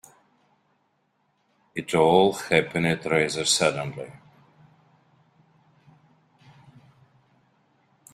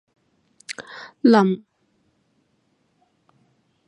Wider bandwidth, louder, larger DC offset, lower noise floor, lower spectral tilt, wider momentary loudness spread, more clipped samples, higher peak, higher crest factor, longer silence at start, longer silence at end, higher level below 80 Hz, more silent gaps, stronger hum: first, 15.5 kHz vs 11 kHz; second, -23 LUFS vs -19 LUFS; neither; about the same, -70 dBFS vs -67 dBFS; second, -3.5 dB/octave vs -6.5 dB/octave; second, 17 LU vs 23 LU; neither; about the same, -4 dBFS vs -2 dBFS; about the same, 24 dB vs 22 dB; first, 1.75 s vs 0.7 s; first, 3.95 s vs 2.3 s; first, -62 dBFS vs -76 dBFS; neither; neither